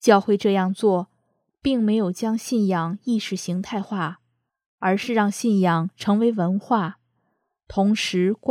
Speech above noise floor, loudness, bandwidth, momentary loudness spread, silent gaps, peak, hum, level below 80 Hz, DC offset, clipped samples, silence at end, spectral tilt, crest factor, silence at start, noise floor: 52 dB; -22 LUFS; 14.5 kHz; 8 LU; 4.66-4.78 s; -2 dBFS; none; -58 dBFS; under 0.1%; under 0.1%; 0 s; -6 dB/octave; 20 dB; 0 s; -73 dBFS